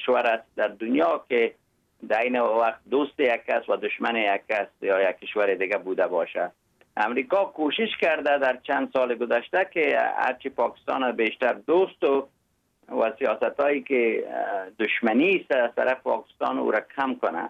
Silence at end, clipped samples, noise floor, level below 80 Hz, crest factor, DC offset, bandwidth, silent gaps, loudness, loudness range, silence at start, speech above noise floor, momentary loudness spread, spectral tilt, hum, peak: 0 s; under 0.1%; -68 dBFS; -74 dBFS; 16 dB; under 0.1%; 7.4 kHz; none; -25 LUFS; 2 LU; 0 s; 44 dB; 6 LU; -6 dB/octave; none; -10 dBFS